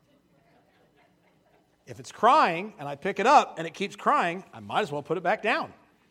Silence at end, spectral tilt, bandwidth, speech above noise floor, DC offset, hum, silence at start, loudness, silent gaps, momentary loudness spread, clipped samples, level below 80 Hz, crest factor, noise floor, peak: 0.4 s; -4.5 dB/octave; 14 kHz; 39 dB; under 0.1%; none; 1.9 s; -25 LUFS; none; 17 LU; under 0.1%; -74 dBFS; 22 dB; -64 dBFS; -6 dBFS